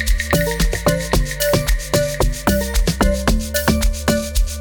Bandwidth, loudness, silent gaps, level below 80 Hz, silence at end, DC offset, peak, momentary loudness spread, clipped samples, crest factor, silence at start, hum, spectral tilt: 19.5 kHz; -18 LUFS; none; -20 dBFS; 0 s; under 0.1%; 0 dBFS; 2 LU; under 0.1%; 16 dB; 0 s; none; -4.5 dB/octave